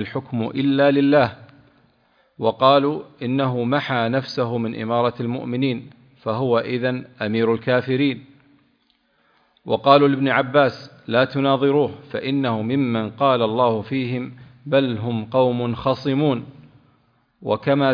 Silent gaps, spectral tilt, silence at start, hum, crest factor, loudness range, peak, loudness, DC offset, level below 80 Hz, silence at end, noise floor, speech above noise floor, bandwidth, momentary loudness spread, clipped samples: none; -8.5 dB/octave; 0 s; none; 20 dB; 4 LU; 0 dBFS; -20 LUFS; under 0.1%; -60 dBFS; 0 s; -64 dBFS; 44 dB; 5.2 kHz; 11 LU; under 0.1%